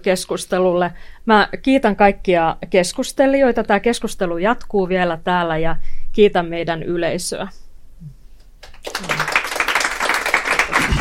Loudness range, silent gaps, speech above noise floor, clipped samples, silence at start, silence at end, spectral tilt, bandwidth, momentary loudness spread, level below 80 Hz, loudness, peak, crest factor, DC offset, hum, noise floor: 6 LU; none; 24 dB; under 0.1%; 0 s; 0 s; -4.5 dB/octave; 16.5 kHz; 10 LU; -34 dBFS; -18 LUFS; 0 dBFS; 18 dB; under 0.1%; none; -40 dBFS